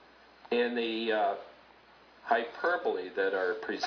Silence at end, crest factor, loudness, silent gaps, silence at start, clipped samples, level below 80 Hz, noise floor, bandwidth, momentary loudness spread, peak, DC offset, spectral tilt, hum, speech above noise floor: 0 s; 20 dB; -31 LUFS; none; 0.45 s; under 0.1%; -76 dBFS; -58 dBFS; 5.4 kHz; 4 LU; -14 dBFS; under 0.1%; -4 dB/octave; none; 28 dB